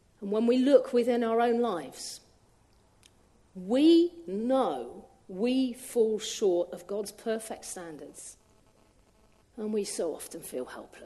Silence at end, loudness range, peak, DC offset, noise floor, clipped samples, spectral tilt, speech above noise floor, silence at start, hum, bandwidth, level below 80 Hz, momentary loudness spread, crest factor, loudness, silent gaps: 0 s; 10 LU; -10 dBFS; under 0.1%; -63 dBFS; under 0.1%; -4.5 dB/octave; 35 dB; 0.2 s; none; 12.5 kHz; -68 dBFS; 20 LU; 20 dB; -28 LUFS; none